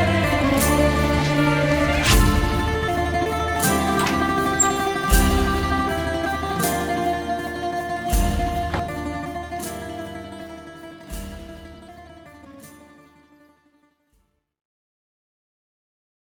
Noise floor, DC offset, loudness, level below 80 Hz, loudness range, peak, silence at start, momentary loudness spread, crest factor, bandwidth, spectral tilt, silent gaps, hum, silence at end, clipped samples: -66 dBFS; under 0.1%; -21 LUFS; -30 dBFS; 19 LU; -4 dBFS; 0 s; 18 LU; 18 dB; over 20 kHz; -4.5 dB/octave; none; none; 3.55 s; under 0.1%